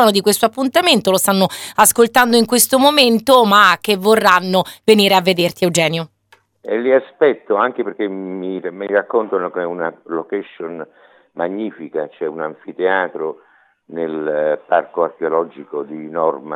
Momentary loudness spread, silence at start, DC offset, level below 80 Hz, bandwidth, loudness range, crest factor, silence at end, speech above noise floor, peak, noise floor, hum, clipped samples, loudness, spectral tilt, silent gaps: 15 LU; 0 s; under 0.1%; -60 dBFS; over 20 kHz; 11 LU; 16 dB; 0 s; 36 dB; 0 dBFS; -51 dBFS; none; under 0.1%; -15 LUFS; -3 dB/octave; none